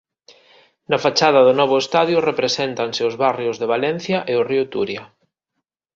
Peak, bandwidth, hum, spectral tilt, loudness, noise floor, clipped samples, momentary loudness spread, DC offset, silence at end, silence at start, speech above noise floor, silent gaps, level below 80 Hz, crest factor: 0 dBFS; 7.6 kHz; none; -4.5 dB/octave; -18 LUFS; -78 dBFS; under 0.1%; 9 LU; under 0.1%; 0.9 s; 0.9 s; 60 dB; none; -62 dBFS; 18 dB